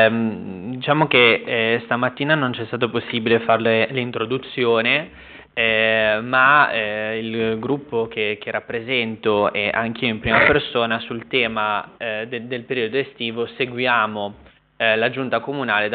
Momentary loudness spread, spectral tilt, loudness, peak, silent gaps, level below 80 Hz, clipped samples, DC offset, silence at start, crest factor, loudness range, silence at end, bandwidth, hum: 11 LU; -2.5 dB/octave; -19 LUFS; -2 dBFS; none; -52 dBFS; under 0.1%; under 0.1%; 0 s; 18 dB; 4 LU; 0 s; 4.7 kHz; none